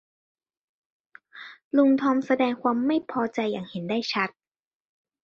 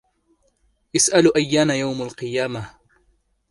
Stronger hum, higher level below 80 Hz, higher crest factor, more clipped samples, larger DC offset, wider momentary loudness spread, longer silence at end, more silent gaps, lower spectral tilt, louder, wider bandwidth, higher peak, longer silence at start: neither; second, -72 dBFS vs -56 dBFS; about the same, 18 dB vs 20 dB; neither; neither; about the same, 12 LU vs 13 LU; first, 0.95 s vs 0.8 s; first, 1.64-1.71 s vs none; first, -6 dB/octave vs -3.5 dB/octave; second, -25 LUFS vs -19 LUFS; second, 7 kHz vs 11.5 kHz; second, -10 dBFS vs -2 dBFS; first, 1.35 s vs 0.95 s